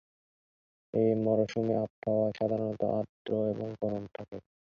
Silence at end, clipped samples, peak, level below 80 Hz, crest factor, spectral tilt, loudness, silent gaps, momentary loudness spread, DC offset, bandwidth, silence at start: 0.3 s; under 0.1%; -14 dBFS; -66 dBFS; 18 dB; -8.5 dB/octave; -31 LUFS; 1.90-2.02 s, 3.09-3.25 s; 9 LU; under 0.1%; 7 kHz; 0.95 s